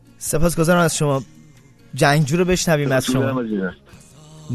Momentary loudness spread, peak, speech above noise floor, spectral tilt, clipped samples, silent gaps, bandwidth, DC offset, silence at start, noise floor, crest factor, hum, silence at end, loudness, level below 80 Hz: 9 LU; -2 dBFS; 30 dB; -5 dB/octave; under 0.1%; none; 14 kHz; under 0.1%; 0.2 s; -47 dBFS; 16 dB; none; 0 s; -19 LUFS; -36 dBFS